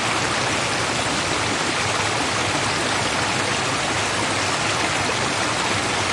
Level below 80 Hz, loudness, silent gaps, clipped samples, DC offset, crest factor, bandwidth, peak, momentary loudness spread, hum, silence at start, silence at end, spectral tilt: -48 dBFS; -20 LUFS; none; under 0.1%; under 0.1%; 14 dB; 11.5 kHz; -8 dBFS; 1 LU; none; 0 s; 0 s; -2.5 dB/octave